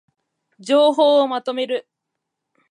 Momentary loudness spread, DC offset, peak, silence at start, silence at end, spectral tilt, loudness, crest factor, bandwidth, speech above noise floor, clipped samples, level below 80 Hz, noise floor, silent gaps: 12 LU; under 0.1%; -4 dBFS; 0.6 s; 0.9 s; -3.5 dB/octave; -18 LUFS; 16 dB; 11 kHz; 63 dB; under 0.1%; -82 dBFS; -80 dBFS; none